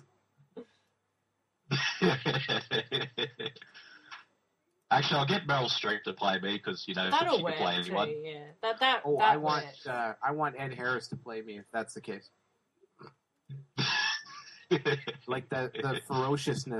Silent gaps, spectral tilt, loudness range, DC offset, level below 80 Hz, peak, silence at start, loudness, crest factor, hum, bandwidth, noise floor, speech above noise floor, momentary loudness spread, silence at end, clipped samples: none; -4.5 dB/octave; 7 LU; under 0.1%; -72 dBFS; -12 dBFS; 0.55 s; -31 LUFS; 22 dB; none; 12.5 kHz; -80 dBFS; 48 dB; 17 LU; 0 s; under 0.1%